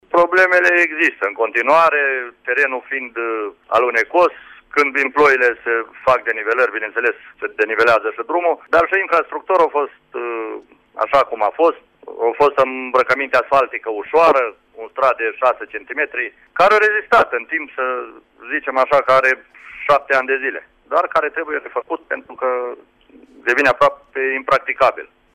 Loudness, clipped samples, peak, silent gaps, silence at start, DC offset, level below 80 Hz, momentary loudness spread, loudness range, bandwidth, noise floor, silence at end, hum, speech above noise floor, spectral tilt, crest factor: -17 LUFS; under 0.1%; -4 dBFS; none; 0.15 s; under 0.1%; -56 dBFS; 12 LU; 3 LU; 14.5 kHz; -46 dBFS; 0.3 s; none; 29 dB; -4 dB/octave; 14 dB